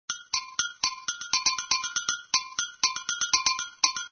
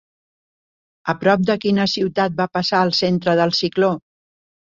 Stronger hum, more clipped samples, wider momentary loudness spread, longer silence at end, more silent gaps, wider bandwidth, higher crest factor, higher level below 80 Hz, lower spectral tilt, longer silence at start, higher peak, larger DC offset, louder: neither; neither; about the same, 6 LU vs 4 LU; second, 0.05 s vs 0.8 s; neither; about the same, 7 kHz vs 7.6 kHz; first, 24 dB vs 18 dB; about the same, -62 dBFS vs -58 dBFS; second, 3 dB/octave vs -5.5 dB/octave; second, 0.1 s vs 1.05 s; second, -6 dBFS vs -2 dBFS; neither; second, -27 LUFS vs -18 LUFS